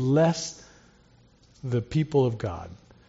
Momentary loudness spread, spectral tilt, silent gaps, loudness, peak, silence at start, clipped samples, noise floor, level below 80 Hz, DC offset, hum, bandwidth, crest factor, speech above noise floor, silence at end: 18 LU; -7 dB/octave; none; -26 LUFS; -10 dBFS; 0 s; under 0.1%; -58 dBFS; -56 dBFS; under 0.1%; none; 8 kHz; 16 dB; 33 dB; 0.35 s